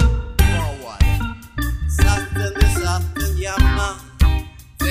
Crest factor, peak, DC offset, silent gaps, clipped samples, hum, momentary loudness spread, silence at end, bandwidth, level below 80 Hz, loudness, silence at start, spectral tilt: 16 dB; -2 dBFS; under 0.1%; none; under 0.1%; none; 8 LU; 0 s; 15.5 kHz; -20 dBFS; -20 LUFS; 0 s; -5 dB/octave